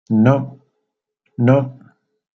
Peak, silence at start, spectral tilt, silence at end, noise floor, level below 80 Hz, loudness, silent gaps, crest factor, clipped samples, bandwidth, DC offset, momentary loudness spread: -2 dBFS; 0.1 s; -10 dB/octave; 0.65 s; -76 dBFS; -56 dBFS; -16 LUFS; none; 16 dB; under 0.1%; 6.4 kHz; under 0.1%; 18 LU